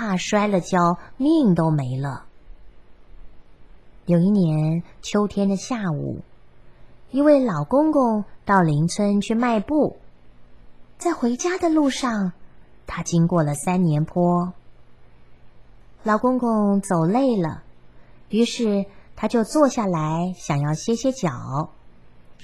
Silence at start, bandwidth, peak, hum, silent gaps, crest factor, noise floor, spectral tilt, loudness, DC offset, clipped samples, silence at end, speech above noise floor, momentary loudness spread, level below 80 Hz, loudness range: 0 s; 12.5 kHz; -4 dBFS; none; none; 18 dB; -49 dBFS; -6.5 dB/octave; -21 LUFS; 0.5%; under 0.1%; 0.05 s; 29 dB; 10 LU; -50 dBFS; 3 LU